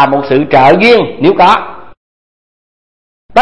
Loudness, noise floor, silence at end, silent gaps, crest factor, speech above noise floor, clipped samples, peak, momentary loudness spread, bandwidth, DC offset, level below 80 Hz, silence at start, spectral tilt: -7 LUFS; under -90 dBFS; 0 s; 1.97-3.29 s; 10 dB; over 83 dB; 1%; 0 dBFS; 8 LU; 11 kHz; 3%; -44 dBFS; 0 s; -6.5 dB/octave